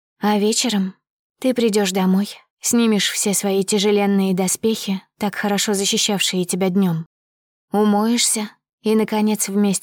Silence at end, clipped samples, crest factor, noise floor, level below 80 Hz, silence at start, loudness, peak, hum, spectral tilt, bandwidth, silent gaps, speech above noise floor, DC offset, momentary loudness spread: 0 s; under 0.1%; 14 dB; under -90 dBFS; -68 dBFS; 0.2 s; -19 LUFS; -6 dBFS; none; -4 dB/octave; 20 kHz; 1.10-1.35 s, 2.50-2.57 s, 7.06-7.68 s, 8.73-8.78 s; over 72 dB; under 0.1%; 8 LU